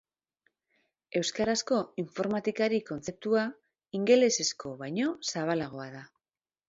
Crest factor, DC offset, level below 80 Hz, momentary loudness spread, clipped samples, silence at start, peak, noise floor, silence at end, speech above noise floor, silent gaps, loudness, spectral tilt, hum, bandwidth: 20 dB; under 0.1%; -68 dBFS; 14 LU; under 0.1%; 1.15 s; -10 dBFS; under -90 dBFS; 0.65 s; over 61 dB; none; -30 LUFS; -3.5 dB/octave; none; 8 kHz